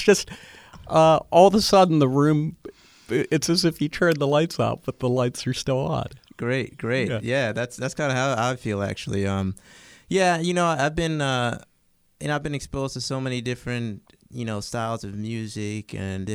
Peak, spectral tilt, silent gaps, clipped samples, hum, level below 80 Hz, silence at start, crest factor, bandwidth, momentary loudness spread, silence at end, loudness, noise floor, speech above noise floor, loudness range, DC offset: -2 dBFS; -5.5 dB/octave; none; under 0.1%; none; -50 dBFS; 0 s; 20 dB; over 20 kHz; 14 LU; 0 s; -23 LUFS; -64 dBFS; 41 dB; 10 LU; under 0.1%